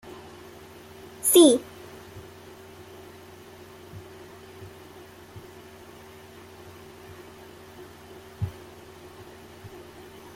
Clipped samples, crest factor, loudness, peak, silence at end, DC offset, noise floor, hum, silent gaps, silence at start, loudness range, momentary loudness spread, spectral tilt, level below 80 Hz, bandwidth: under 0.1%; 24 dB; -20 LUFS; -6 dBFS; 1.85 s; under 0.1%; -47 dBFS; none; none; 1.25 s; 21 LU; 20 LU; -4 dB/octave; -62 dBFS; 16 kHz